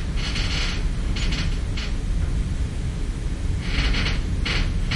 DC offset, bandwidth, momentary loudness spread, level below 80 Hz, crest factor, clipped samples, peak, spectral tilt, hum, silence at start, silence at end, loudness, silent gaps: under 0.1%; 11.5 kHz; 5 LU; -24 dBFS; 14 dB; under 0.1%; -8 dBFS; -4.5 dB/octave; none; 0 s; 0 s; -26 LUFS; none